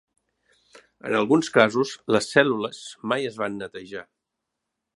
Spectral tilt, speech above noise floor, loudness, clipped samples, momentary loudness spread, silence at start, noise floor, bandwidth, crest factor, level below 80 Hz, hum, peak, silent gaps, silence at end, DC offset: -4.5 dB/octave; 59 dB; -23 LUFS; under 0.1%; 17 LU; 1.05 s; -82 dBFS; 11.5 kHz; 24 dB; -68 dBFS; none; 0 dBFS; none; 0.95 s; under 0.1%